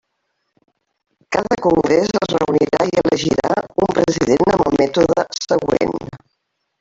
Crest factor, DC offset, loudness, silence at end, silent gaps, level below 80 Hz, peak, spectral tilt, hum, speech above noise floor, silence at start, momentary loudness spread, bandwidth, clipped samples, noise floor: 16 dB; under 0.1%; -17 LUFS; 0.65 s; none; -46 dBFS; -2 dBFS; -5.5 dB/octave; none; 56 dB; 1.3 s; 5 LU; 7.8 kHz; under 0.1%; -72 dBFS